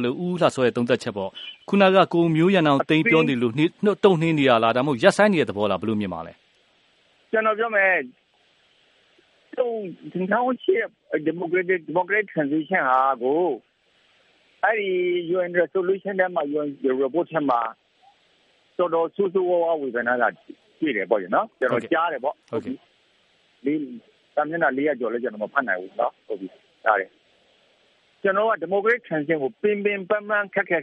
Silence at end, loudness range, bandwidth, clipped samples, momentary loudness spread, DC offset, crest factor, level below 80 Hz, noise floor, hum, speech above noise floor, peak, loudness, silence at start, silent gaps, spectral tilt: 0 s; 7 LU; 11.5 kHz; under 0.1%; 12 LU; under 0.1%; 22 dB; -70 dBFS; -62 dBFS; none; 40 dB; 0 dBFS; -22 LUFS; 0 s; none; -6.5 dB/octave